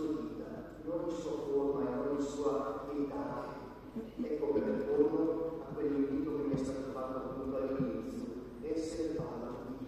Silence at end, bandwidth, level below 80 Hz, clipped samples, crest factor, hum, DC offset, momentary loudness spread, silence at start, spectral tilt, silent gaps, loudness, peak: 0 s; 14 kHz; -58 dBFS; under 0.1%; 20 dB; none; under 0.1%; 10 LU; 0 s; -7 dB/octave; none; -37 LUFS; -16 dBFS